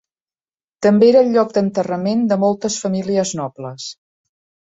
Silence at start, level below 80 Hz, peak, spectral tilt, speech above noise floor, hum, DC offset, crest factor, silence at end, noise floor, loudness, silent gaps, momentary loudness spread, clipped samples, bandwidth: 0.8 s; -62 dBFS; -2 dBFS; -5.5 dB/octave; over 74 dB; none; under 0.1%; 16 dB; 0.8 s; under -90 dBFS; -16 LUFS; none; 17 LU; under 0.1%; 8 kHz